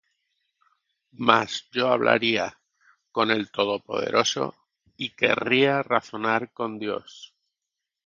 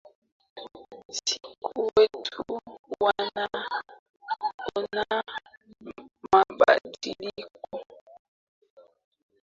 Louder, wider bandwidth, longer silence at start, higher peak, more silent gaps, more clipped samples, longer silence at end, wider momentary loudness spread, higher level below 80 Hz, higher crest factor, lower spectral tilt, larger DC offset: first, -24 LUFS vs -27 LUFS; about the same, 7.6 kHz vs 7.6 kHz; first, 1.2 s vs 0.55 s; first, 0 dBFS vs -6 dBFS; second, none vs 1.05-1.09 s, 2.79-2.84 s, 3.99-4.14 s, 4.54-4.59 s, 5.57-5.61 s; neither; second, 0.8 s vs 1.6 s; second, 12 LU vs 23 LU; about the same, -70 dBFS vs -66 dBFS; about the same, 26 dB vs 24 dB; about the same, -3.5 dB/octave vs -2.5 dB/octave; neither